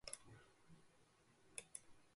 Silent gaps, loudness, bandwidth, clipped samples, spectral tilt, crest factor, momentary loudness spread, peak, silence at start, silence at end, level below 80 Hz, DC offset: none; -57 LUFS; 11.5 kHz; under 0.1%; -1.5 dB/octave; 32 dB; 13 LU; -30 dBFS; 0.05 s; 0 s; -80 dBFS; under 0.1%